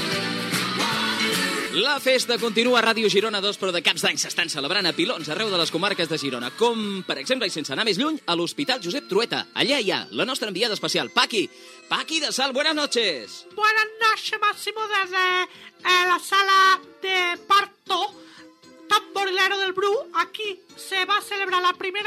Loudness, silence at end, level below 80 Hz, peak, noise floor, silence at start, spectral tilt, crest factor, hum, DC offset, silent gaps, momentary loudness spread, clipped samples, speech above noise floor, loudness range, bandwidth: -22 LUFS; 0 s; -82 dBFS; -4 dBFS; -48 dBFS; 0 s; -2.5 dB/octave; 20 dB; none; under 0.1%; none; 7 LU; under 0.1%; 25 dB; 4 LU; 16 kHz